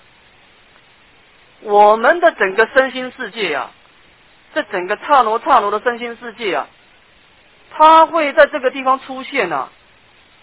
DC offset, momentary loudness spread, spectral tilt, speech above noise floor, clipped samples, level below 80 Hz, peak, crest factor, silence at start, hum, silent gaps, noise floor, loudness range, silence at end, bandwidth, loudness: 0.1%; 15 LU; -7 dB/octave; 35 dB; 0.1%; -58 dBFS; 0 dBFS; 16 dB; 1.65 s; none; none; -50 dBFS; 3 LU; 0.75 s; 4 kHz; -15 LUFS